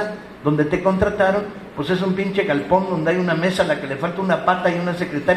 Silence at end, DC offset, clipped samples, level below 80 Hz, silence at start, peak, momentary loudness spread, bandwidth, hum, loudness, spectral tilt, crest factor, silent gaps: 0 s; under 0.1%; under 0.1%; -46 dBFS; 0 s; -2 dBFS; 6 LU; 12.5 kHz; none; -20 LUFS; -6.5 dB/octave; 18 dB; none